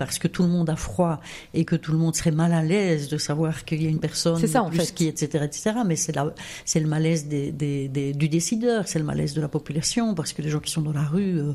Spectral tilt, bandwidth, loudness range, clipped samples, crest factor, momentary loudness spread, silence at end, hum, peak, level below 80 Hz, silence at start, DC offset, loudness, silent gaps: -5.5 dB/octave; 14.5 kHz; 2 LU; under 0.1%; 18 dB; 5 LU; 0 s; none; -6 dBFS; -48 dBFS; 0 s; under 0.1%; -24 LUFS; none